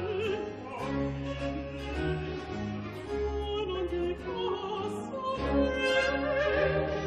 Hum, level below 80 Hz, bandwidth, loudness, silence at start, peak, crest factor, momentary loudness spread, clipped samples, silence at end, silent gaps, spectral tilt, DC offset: none; -44 dBFS; 12.5 kHz; -32 LUFS; 0 s; -14 dBFS; 16 dB; 9 LU; under 0.1%; 0 s; none; -6 dB/octave; under 0.1%